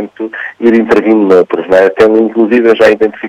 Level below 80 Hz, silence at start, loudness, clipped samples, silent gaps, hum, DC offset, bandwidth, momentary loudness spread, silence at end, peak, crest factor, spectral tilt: -48 dBFS; 0 s; -8 LUFS; 0.3%; none; none; under 0.1%; 9.4 kHz; 7 LU; 0 s; 0 dBFS; 8 dB; -6.5 dB/octave